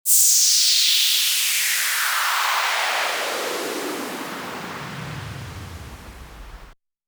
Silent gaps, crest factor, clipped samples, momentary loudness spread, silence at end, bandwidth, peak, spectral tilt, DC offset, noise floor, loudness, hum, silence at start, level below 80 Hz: none; 20 dB; under 0.1%; 21 LU; 0.35 s; over 20 kHz; -2 dBFS; 0 dB/octave; under 0.1%; -47 dBFS; -17 LUFS; none; 0.05 s; -50 dBFS